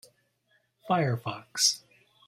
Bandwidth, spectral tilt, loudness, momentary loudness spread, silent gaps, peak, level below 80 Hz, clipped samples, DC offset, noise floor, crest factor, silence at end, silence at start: 16 kHz; -3 dB/octave; -28 LUFS; 11 LU; none; -10 dBFS; -72 dBFS; under 0.1%; under 0.1%; -71 dBFS; 22 dB; 0.5 s; 0.85 s